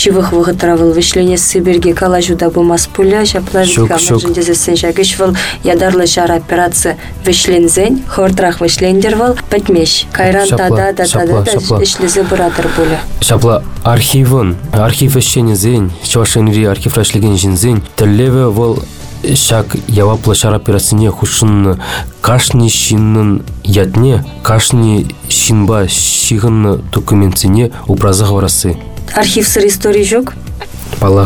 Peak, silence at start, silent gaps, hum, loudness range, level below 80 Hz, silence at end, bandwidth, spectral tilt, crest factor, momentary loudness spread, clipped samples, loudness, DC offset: 0 dBFS; 0 s; none; none; 1 LU; -28 dBFS; 0 s; over 20 kHz; -4.5 dB/octave; 8 dB; 5 LU; under 0.1%; -10 LUFS; under 0.1%